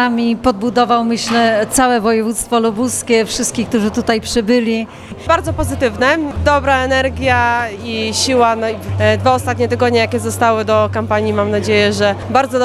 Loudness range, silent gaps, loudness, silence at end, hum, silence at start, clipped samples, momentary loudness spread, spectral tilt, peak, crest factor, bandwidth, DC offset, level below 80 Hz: 2 LU; none; -14 LUFS; 0 s; none; 0 s; under 0.1%; 5 LU; -4.5 dB/octave; 0 dBFS; 14 dB; 15 kHz; under 0.1%; -38 dBFS